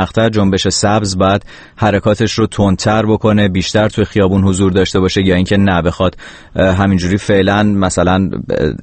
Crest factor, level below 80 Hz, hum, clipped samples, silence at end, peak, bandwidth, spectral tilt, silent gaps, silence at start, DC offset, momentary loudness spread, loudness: 12 dB; -34 dBFS; none; under 0.1%; 0.05 s; 0 dBFS; 8.8 kHz; -5.5 dB/octave; none; 0 s; under 0.1%; 4 LU; -13 LUFS